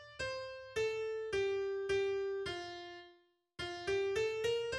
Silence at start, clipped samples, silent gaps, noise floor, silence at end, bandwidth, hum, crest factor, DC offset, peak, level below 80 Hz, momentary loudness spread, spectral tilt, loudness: 0 s; under 0.1%; none; -68 dBFS; 0 s; 12.5 kHz; none; 14 dB; under 0.1%; -24 dBFS; -64 dBFS; 11 LU; -4 dB/octave; -38 LUFS